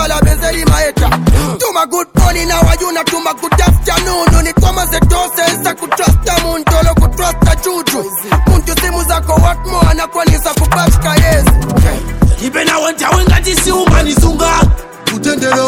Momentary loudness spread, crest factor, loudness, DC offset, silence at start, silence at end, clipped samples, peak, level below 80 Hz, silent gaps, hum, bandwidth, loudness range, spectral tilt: 4 LU; 10 dB; -11 LUFS; under 0.1%; 0 s; 0 s; under 0.1%; 0 dBFS; -14 dBFS; none; none; 17.5 kHz; 1 LU; -4.5 dB/octave